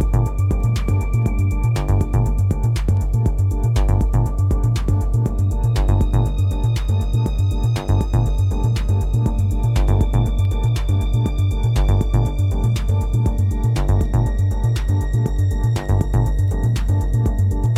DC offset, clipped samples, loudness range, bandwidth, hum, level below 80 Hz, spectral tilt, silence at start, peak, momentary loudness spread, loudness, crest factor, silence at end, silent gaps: under 0.1%; under 0.1%; 1 LU; 14 kHz; none; -22 dBFS; -7.5 dB/octave; 0 s; -4 dBFS; 2 LU; -19 LUFS; 12 dB; 0 s; none